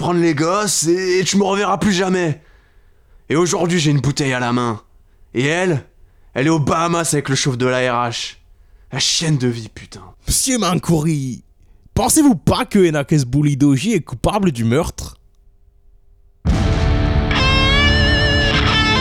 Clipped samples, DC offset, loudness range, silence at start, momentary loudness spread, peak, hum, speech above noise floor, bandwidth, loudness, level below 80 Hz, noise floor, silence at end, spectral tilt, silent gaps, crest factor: under 0.1%; under 0.1%; 4 LU; 0 s; 12 LU; 0 dBFS; none; 33 dB; 16.5 kHz; -16 LUFS; -28 dBFS; -50 dBFS; 0 s; -4.5 dB/octave; none; 16 dB